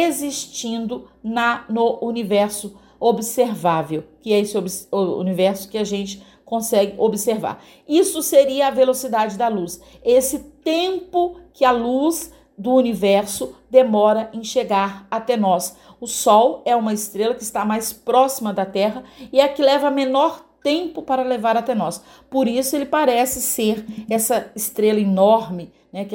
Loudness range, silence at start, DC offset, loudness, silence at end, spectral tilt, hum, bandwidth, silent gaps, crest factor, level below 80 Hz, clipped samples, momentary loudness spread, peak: 3 LU; 0 s; under 0.1%; -19 LUFS; 0 s; -4 dB/octave; none; 17 kHz; none; 18 dB; -56 dBFS; under 0.1%; 11 LU; 0 dBFS